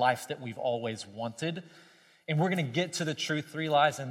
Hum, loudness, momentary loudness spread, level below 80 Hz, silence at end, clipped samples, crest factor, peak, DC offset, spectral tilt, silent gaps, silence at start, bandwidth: none; -31 LUFS; 12 LU; -80 dBFS; 0 s; under 0.1%; 20 dB; -12 dBFS; under 0.1%; -5 dB/octave; none; 0 s; 16 kHz